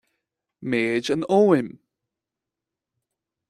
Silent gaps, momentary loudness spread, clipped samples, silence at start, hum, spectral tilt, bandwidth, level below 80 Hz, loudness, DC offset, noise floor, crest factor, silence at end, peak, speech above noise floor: none; 15 LU; under 0.1%; 0.6 s; none; -6 dB/octave; 12 kHz; -68 dBFS; -21 LUFS; under 0.1%; -87 dBFS; 20 dB; 1.8 s; -6 dBFS; 66 dB